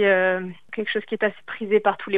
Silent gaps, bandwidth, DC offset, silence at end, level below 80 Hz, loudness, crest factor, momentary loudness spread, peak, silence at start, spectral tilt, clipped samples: none; 4.8 kHz; 0.5%; 0 s; -70 dBFS; -24 LUFS; 18 dB; 11 LU; -4 dBFS; 0 s; -7.5 dB/octave; under 0.1%